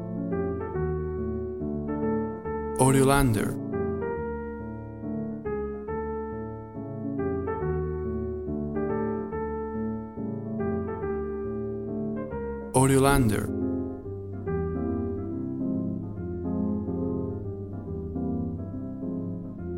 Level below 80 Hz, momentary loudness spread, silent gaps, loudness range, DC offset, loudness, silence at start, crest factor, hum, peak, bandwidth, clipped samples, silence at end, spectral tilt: -42 dBFS; 12 LU; none; 6 LU; 0.1%; -29 LUFS; 0 s; 22 dB; none; -6 dBFS; 16 kHz; under 0.1%; 0 s; -6.5 dB/octave